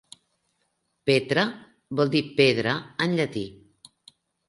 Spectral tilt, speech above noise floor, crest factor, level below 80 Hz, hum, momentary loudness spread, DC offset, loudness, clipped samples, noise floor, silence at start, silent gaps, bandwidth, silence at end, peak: -5.5 dB/octave; 50 dB; 22 dB; -64 dBFS; none; 12 LU; under 0.1%; -24 LUFS; under 0.1%; -74 dBFS; 1.05 s; none; 11.5 kHz; 0.95 s; -6 dBFS